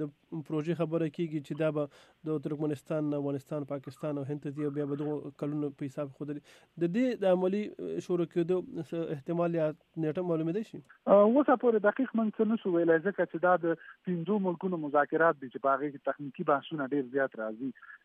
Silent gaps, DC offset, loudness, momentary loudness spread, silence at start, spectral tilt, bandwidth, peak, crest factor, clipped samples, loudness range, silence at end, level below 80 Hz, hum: none; under 0.1%; -31 LUFS; 11 LU; 0 s; -8.5 dB/octave; 11.5 kHz; -12 dBFS; 20 dB; under 0.1%; 8 LU; 0.1 s; -80 dBFS; none